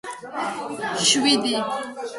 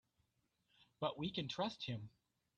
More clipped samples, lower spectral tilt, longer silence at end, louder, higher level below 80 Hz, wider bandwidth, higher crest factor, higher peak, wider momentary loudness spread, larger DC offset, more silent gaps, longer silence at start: neither; second, -1.5 dB/octave vs -6 dB/octave; second, 0 s vs 0.5 s; first, -21 LUFS vs -44 LUFS; first, -66 dBFS vs -76 dBFS; first, 11.5 kHz vs 9.4 kHz; about the same, 20 dB vs 20 dB; first, -4 dBFS vs -26 dBFS; first, 12 LU vs 7 LU; neither; neither; second, 0.05 s vs 1 s